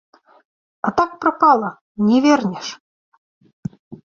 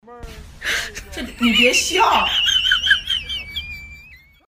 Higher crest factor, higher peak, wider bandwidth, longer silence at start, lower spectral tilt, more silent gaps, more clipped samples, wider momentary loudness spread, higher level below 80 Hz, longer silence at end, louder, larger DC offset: about the same, 18 dB vs 18 dB; about the same, -2 dBFS vs -2 dBFS; second, 7.4 kHz vs 15.5 kHz; first, 0.85 s vs 0.1 s; first, -5.5 dB/octave vs -1.5 dB/octave; first, 1.81-1.95 s, 2.80-3.41 s, 3.53-3.63 s, 3.79-3.91 s vs none; neither; about the same, 19 LU vs 18 LU; second, -58 dBFS vs -40 dBFS; second, 0.1 s vs 0.4 s; about the same, -17 LUFS vs -16 LUFS; neither